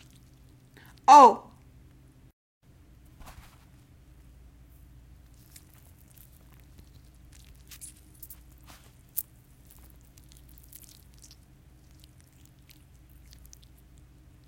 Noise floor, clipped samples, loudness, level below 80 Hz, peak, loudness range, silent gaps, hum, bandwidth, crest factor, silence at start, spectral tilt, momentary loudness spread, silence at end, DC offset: -56 dBFS; under 0.1%; -19 LUFS; -56 dBFS; -4 dBFS; 29 LU; 2.33-2.61 s; 60 Hz at -70 dBFS; 17 kHz; 26 dB; 1.1 s; -4 dB/octave; 34 LU; 5.25 s; under 0.1%